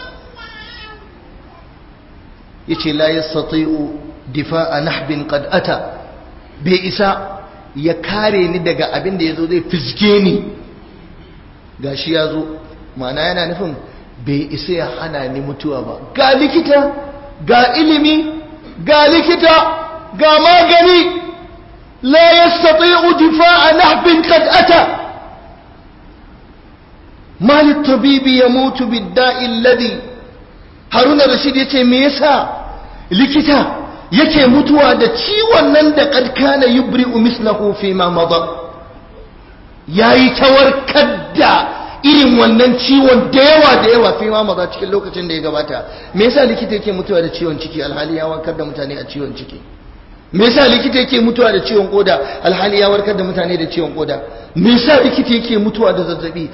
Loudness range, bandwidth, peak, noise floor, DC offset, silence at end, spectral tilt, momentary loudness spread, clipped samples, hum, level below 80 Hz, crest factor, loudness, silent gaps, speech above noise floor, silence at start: 10 LU; 5.8 kHz; 0 dBFS; -39 dBFS; under 0.1%; 0 s; -7.5 dB/octave; 16 LU; under 0.1%; none; -40 dBFS; 12 dB; -11 LUFS; none; 28 dB; 0 s